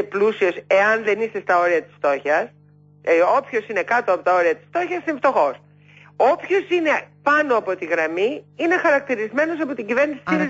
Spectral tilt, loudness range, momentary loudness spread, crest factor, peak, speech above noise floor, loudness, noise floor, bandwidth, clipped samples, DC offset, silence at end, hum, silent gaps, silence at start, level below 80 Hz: -5.5 dB/octave; 1 LU; 7 LU; 14 dB; -6 dBFS; 29 dB; -20 LUFS; -49 dBFS; 7.8 kHz; under 0.1%; under 0.1%; 0 s; 50 Hz at -50 dBFS; none; 0 s; -72 dBFS